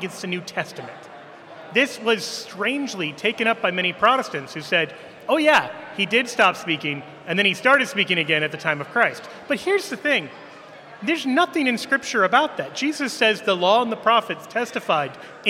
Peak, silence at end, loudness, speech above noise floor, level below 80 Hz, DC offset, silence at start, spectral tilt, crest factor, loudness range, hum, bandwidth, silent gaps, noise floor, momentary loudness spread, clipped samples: -2 dBFS; 0 s; -21 LUFS; 20 dB; -70 dBFS; under 0.1%; 0 s; -3.5 dB/octave; 20 dB; 3 LU; none; 16 kHz; none; -42 dBFS; 12 LU; under 0.1%